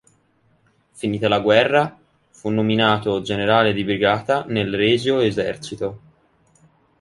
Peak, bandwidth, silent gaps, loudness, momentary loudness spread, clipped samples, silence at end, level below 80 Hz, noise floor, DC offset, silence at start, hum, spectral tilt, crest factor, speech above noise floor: -2 dBFS; 11.5 kHz; none; -19 LUFS; 12 LU; under 0.1%; 1 s; -54 dBFS; -61 dBFS; under 0.1%; 0.95 s; none; -6 dB/octave; 18 dB; 42 dB